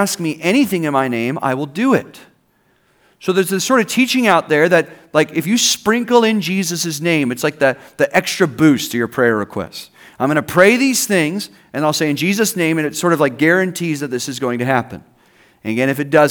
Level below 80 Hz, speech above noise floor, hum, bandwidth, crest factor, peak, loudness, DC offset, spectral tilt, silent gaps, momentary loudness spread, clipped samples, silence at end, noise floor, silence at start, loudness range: -62 dBFS; 43 dB; none; over 20 kHz; 16 dB; 0 dBFS; -16 LUFS; under 0.1%; -4 dB/octave; none; 8 LU; under 0.1%; 0 s; -59 dBFS; 0 s; 4 LU